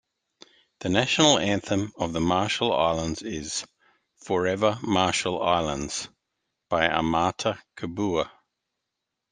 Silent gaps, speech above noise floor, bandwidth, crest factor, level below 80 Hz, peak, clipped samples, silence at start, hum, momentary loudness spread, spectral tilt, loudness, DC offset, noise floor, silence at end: none; 59 dB; 10 kHz; 24 dB; -54 dBFS; -2 dBFS; under 0.1%; 0.8 s; none; 11 LU; -4 dB/octave; -25 LUFS; under 0.1%; -83 dBFS; 1.05 s